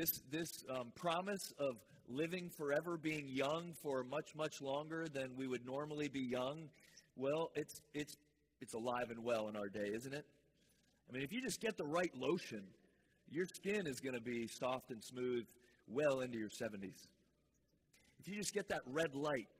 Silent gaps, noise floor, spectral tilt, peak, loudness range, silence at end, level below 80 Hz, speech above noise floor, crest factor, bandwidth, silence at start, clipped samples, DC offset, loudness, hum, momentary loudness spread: none; -80 dBFS; -4.5 dB/octave; -24 dBFS; 3 LU; 0.15 s; -80 dBFS; 36 dB; 20 dB; 16 kHz; 0 s; under 0.1%; under 0.1%; -44 LUFS; none; 11 LU